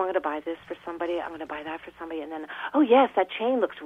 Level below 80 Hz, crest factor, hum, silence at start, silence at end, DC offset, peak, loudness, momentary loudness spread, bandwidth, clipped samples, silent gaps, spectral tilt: -66 dBFS; 18 dB; none; 0 s; 0 s; under 0.1%; -8 dBFS; -27 LUFS; 17 LU; 5.6 kHz; under 0.1%; none; -6 dB/octave